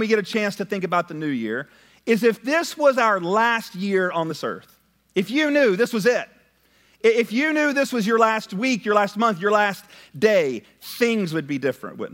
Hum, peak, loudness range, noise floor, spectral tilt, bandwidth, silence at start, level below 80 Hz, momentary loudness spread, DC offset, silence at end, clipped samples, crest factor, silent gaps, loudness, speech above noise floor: none; -4 dBFS; 2 LU; -60 dBFS; -5 dB/octave; 16.5 kHz; 0 s; -72 dBFS; 10 LU; under 0.1%; 0.05 s; under 0.1%; 18 dB; none; -21 LUFS; 38 dB